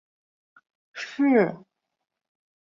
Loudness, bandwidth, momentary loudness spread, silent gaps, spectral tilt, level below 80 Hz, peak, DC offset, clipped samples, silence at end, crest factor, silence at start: -23 LUFS; 7.2 kHz; 23 LU; none; -6.5 dB/octave; -74 dBFS; -8 dBFS; under 0.1%; under 0.1%; 1.05 s; 20 dB; 0.95 s